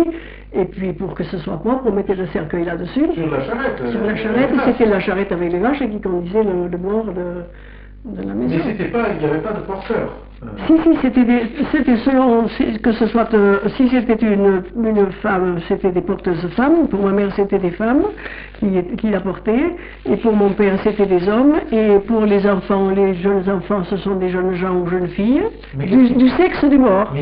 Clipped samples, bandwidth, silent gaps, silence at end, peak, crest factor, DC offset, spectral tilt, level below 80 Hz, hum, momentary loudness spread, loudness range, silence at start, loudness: under 0.1%; 5.2 kHz; none; 0 s; -4 dBFS; 14 dB; under 0.1%; -6.5 dB/octave; -38 dBFS; none; 10 LU; 6 LU; 0 s; -17 LUFS